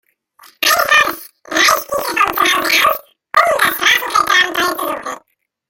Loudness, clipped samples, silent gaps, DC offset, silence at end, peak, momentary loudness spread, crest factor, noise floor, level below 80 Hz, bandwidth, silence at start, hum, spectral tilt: -13 LUFS; under 0.1%; none; under 0.1%; 0.5 s; 0 dBFS; 11 LU; 16 dB; -62 dBFS; -52 dBFS; 17 kHz; 0.6 s; none; 0 dB/octave